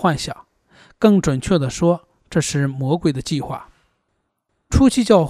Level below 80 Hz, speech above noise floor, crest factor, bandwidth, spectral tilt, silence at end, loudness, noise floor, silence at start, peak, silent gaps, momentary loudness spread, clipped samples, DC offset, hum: -36 dBFS; 55 dB; 18 dB; 14.5 kHz; -6 dB/octave; 0 s; -19 LUFS; -71 dBFS; 0 s; 0 dBFS; none; 12 LU; under 0.1%; under 0.1%; none